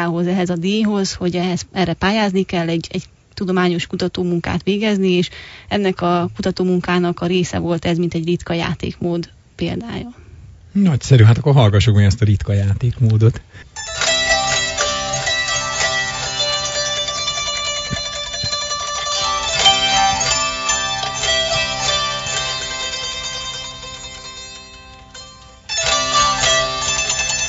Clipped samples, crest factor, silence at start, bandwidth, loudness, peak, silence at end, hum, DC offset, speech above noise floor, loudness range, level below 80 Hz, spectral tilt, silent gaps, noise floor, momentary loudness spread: under 0.1%; 18 dB; 0 s; 8 kHz; -17 LUFS; 0 dBFS; 0 s; none; under 0.1%; 24 dB; 6 LU; -40 dBFS; -4 dB/octave; none; -40 dBFS; 14 LU